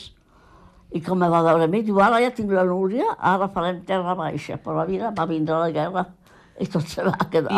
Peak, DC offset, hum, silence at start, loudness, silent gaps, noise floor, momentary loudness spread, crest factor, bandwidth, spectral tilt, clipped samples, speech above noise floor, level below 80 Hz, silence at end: -6 dBFS; under 0.1%; none; 0 s; -22 LUFS; none; -53 dBFS; 11 LU; 16 dB; 13.5 kHz; -7 dB/octave; under 0.1%; 31 dB; -56 dBFS; 0 s